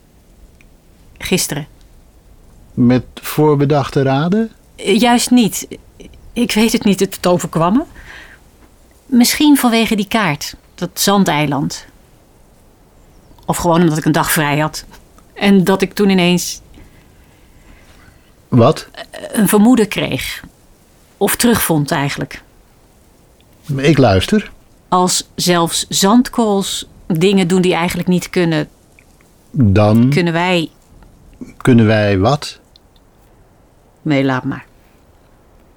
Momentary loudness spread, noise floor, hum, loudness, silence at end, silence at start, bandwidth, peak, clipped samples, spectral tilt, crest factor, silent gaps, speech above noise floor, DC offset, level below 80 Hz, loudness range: 16 LU; -49 dBFS; none; -14 LUFS; 1.15 s; 0.45 s; over 20 kHz; -2 dBFS; under 0.1%; -5 dB/octave; 14 dB; none; 35 dB; under 0.1%; -44 dBFS; 4 LU